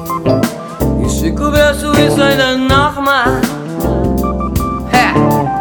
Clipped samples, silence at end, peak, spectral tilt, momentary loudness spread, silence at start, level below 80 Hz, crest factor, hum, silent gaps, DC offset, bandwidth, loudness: under 0.1%; 0 s; 0 dBFS; -5.5 dB/octave; 6 LU; 0 s; -24 dBFS; 12 dB; none; none; under 0.1%; 19.5 kHz; -13 LUFS